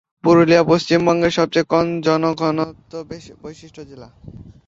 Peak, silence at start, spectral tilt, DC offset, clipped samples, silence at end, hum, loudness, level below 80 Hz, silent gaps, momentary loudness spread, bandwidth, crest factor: -2 dBFS; 0.25 s; -6 dB/octave; under 0.1%; under 0.1%; 0.15 s; none; -16 LUFS; -50 dBFS; none; 23 LU; 7.8 kHz; 16 dB